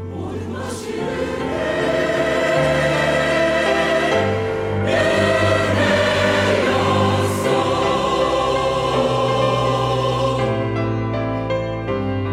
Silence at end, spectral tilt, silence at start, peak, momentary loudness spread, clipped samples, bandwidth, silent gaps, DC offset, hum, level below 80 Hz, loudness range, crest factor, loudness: 0 s; -5.5 dB/octave; 0 s; -4 dBFS; 7 LU; under 0.1%; 15.5 kHz; none; under 0.1%; none; -40 dBFS; 3 LU; 14 dB; -18 LUFS